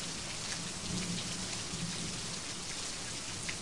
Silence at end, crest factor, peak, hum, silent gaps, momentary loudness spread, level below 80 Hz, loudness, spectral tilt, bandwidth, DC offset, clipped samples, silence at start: 0 s; 18 dB; -20 dBFS; none; none; 2 LU; -56 dBFS; -37 LUFS; -2 dB/octave; 11.5 kHz; 0.3%; under 0.1%; 0 s